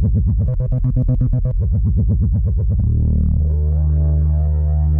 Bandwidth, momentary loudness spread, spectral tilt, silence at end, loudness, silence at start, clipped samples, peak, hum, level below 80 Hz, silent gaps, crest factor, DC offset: 1.3 kHz; 2 LU; -14.5 dB/octave; 0 s; -18 LUFS; 0 s; under 0.1%; -6 dBFS; none; -18 dBFS; none; 10 dB; under 0.1%